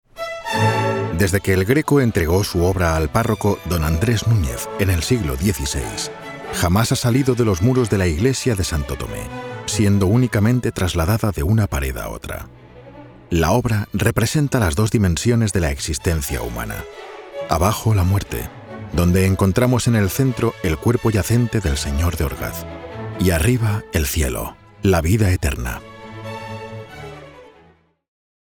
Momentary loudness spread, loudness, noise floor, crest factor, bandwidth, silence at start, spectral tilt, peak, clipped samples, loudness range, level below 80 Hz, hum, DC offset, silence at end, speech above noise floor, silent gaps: 14 LU; -19 LUFS; -53 dBFS; 18 dB; 20 kHz; 0.15 s; -5.5 dB/octave; -2 dBFS; under 0.1%; 3 LU; -32 dBFS; none; under 0.1%; 1 s; 35 dB; none